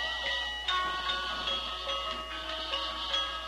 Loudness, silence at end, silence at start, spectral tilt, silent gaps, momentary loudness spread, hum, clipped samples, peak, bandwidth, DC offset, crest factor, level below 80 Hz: -32 LUFS; 0 s; 0 s; -1.5 dB/octave; none; 5 LU; none; under 0.1%; -18 dBFS; 13 kHz; under 0.1%; 16 dB; -50 dBFS